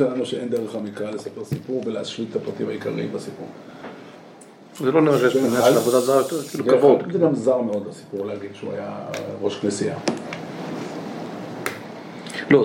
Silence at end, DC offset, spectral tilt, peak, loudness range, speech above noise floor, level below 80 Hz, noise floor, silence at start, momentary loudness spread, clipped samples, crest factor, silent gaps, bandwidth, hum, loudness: 0 s; under 0.1%; -5.5 dB/octave; -2 dBFS; 10 LU; 23 dB; -68 dBFS; -45 dBFS; 0 s; 18 LU; under 0.1%; 20 dB; none; 17 kHz; none; -23 LUFS